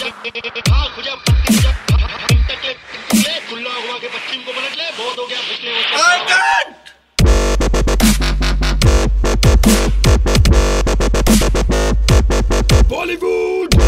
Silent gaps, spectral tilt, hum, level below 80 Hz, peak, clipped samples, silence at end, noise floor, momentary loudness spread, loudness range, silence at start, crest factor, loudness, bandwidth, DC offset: none; -4.5 dB/octave; none; -16 dBFS; 0 dBFS; under 0.1%; 0 s; -41 dBFS; 10 LU; 5 LU; 0 s; 14 dB; -15 LUFS; 16 kHz; under 0.1%